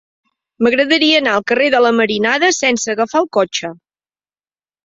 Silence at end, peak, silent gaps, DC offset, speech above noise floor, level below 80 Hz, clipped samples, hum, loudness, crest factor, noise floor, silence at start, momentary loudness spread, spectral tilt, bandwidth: 1.1 s; 0 dBFS; none; under 0.1%; over 76 dB; -60 dBFS; under 0.1%; none; -14 LUFS; 16 dB; under -90 dBFS; 0.6 s; 6 LU; -2.5 dB/octave; 7.8 kHz